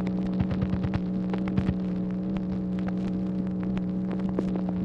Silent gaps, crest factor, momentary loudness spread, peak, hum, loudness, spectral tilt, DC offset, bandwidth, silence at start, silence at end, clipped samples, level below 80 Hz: none; 16 dB; 2 LU; -12 dBFS; none; -29 LUFS; -10 dB/octave; under 0.1%; 5.6 kHz; 0 s; 0 s; under 0.1%; -44 dBFS